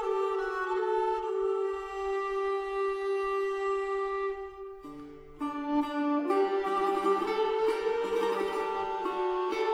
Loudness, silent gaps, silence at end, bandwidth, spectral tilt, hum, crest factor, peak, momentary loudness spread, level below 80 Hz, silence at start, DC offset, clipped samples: -30 LUFS; none; 0 s; 11.5 kHz; -4.5 dB/octave; none; 14 dB; -16 dBFS; 8 LU; -58 dBFS; 0 s; under 0.1%; under 0.1%